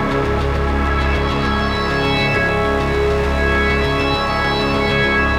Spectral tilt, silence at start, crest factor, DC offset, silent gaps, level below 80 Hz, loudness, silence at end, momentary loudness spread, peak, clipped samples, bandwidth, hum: -6 dB/octave; 0 s; 14 dB; under 0.1%; none; -24 dBFS; -17 LUFS; 0 s; 3 LU; -4 dBFS; under 0.1%; 13.5 kHz; none